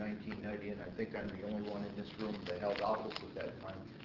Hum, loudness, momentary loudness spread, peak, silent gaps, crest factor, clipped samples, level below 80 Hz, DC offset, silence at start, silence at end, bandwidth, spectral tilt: none; -42 LUFS; 8 LU; -24 dBFS; none; 18 dB; under 0.1%; -66 dBFS; under 0.1%; 0 s; 0 s; 6 kHz; -4.5 dB/octave